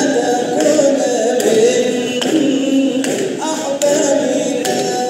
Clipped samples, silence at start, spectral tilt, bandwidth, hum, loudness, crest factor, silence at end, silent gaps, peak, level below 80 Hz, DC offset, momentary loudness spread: under 0.1%; 0 s; -3.5 dB/octave; 16 kHz; none; -15 LUFS; 14 dB; 0 s; none; -2 dBFS; -68 dBFS; under 0.1%; 5 LU